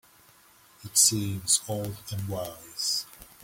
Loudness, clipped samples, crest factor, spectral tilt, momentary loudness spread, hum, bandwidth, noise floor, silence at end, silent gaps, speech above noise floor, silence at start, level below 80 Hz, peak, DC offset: -26 LUFS; under 0.1%; 24 dB; -2.5 dB/octave; 15 LU; none; 17 kHz; -58 dBFS; 0.2 s; none; 29 dB; 0.8 s; -60 dBFS; -6 dBFS; under 0.1%